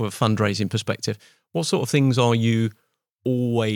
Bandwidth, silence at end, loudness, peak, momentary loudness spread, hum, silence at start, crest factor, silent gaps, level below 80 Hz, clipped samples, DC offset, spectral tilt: 17.5 kHz; 0 s; -22 LUFS; -4 dBFS; 11 LU; none; 0 s; 18 dB; 3.15-3.19 s; -68 dBFS; under 0.1%; under 0.1%; -6 dB/octave